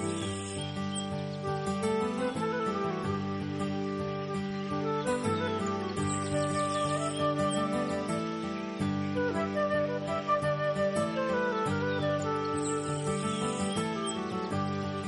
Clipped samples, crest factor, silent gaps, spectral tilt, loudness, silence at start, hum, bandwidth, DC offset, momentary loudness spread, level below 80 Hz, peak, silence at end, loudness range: under 0.1%; 14 dB; none; -5.5 dB/octave; -31 LUFS; 0 s; none; 11.5 kHz; under 0.1%; 5 LU; -60 dBFS; -18 dBFS; 0 s; 2 LU